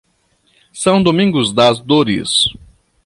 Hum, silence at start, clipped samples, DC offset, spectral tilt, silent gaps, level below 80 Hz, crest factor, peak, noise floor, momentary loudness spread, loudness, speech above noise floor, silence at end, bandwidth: none; 0.75 s; under 0.1%; under 0.1%; -4.5 dB/octave; none; -46 dBFS; 14 dB; -2 dBFS; -59 dBFS; 3 LU; -13 LUFS; 46 dB; 0.5 s; 11.5 kHz